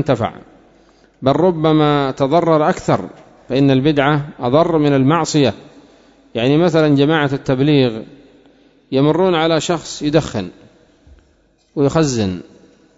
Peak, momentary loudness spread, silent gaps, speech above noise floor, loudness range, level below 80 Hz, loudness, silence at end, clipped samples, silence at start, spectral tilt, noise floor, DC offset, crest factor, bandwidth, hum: 0 dBFS; 10 LU; none; 41 dB; 4 LU; -46 dBFS; -15 LUFS; 0.55 s; under 0.1%; 0 s; -6.5 dB/octave; -56 dBFS; under 0.1%; 16 dB; 8 kHz; none